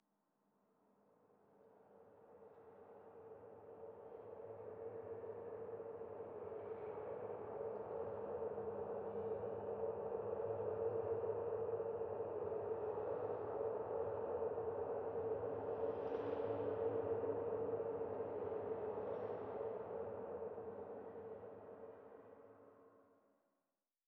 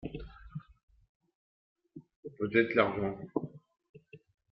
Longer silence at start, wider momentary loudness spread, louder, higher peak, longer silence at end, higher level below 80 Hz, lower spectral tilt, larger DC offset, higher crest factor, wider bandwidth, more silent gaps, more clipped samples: first, 1.55 s vs 0 s; second, 16 LU vs 21 LU; second, -45 LUFS vs -31 LUFS; second, -30 dBFS vs -8 dBFS; first, 1.05 s vs 0.35 s; second, -76 dBFS vs -60 dBFS; first, -7.5 dB/octave vs -4.5 dB/octave; neither; second, 16 dB vs 28 dB; second, 3.8 kHz vs 5.6 kHz; second, none vs 0.83-0.88 s, 1.09-1.20 s, 1.35-1.76 s, 2.16-2.23 s, 3.89-3.94 s; neither